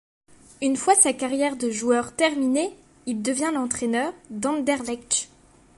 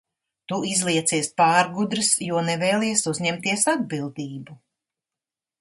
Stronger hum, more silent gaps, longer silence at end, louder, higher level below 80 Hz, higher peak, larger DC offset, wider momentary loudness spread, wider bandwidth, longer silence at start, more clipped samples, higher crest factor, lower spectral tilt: neither; neither; second, 0.5 s vs 1.05 s; about the same, -23 LUFS vs -22 LUFS; first, -60 dBFS vs -68 dBFS; about the same, -2 dBFS vs -4 dBFS; neither; about the same, 11 LU vs 12 LU; about the same, 11.5 kHz vs 12 kHz; about the same, 0.6 s vs 0.5 s; neither; about the same, 22 dB vs 20 dB; about the same, -2 dB/octave vs -3 dB/octave